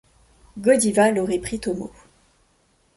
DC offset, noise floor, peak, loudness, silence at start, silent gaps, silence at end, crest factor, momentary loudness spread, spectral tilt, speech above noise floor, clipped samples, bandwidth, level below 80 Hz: under 0.1%; -63 dBFS; -4 dBFS; -21 LUFS; 0.55 s; none; 1.1 s; 18 dB; 17 LU; -4.5 dB/octave; 42 dB; under 0.1%; 12 kHz; -52 dBFS